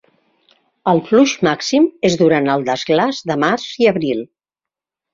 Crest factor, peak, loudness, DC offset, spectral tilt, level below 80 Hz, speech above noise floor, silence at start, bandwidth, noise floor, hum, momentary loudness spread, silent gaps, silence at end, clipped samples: 16 dB; -2 dBFS; -16 LUFS; under 0.1%; -5 dB/octave; -58 dBFS; 72 dB; 0.85 s; 7.6 kHz; -87 dBFS; none; 7 LU; none; 0.9 s; under 0.1%